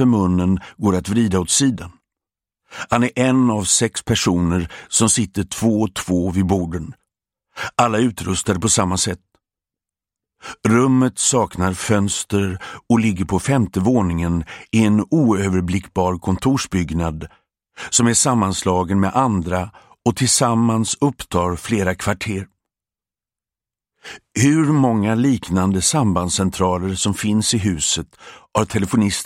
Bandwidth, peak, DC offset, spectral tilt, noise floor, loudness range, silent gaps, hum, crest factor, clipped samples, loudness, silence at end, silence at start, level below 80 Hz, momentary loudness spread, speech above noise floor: 16 kHz; 0 dBFS; under 0.1%; -4.5 dB/octave; under -90 dBFS; 3 LU; none; none; 18 dB; under 0.1%; -18 LUFS; 0 s; 0 s; -42 dBFS; 9 LU; over 72 dB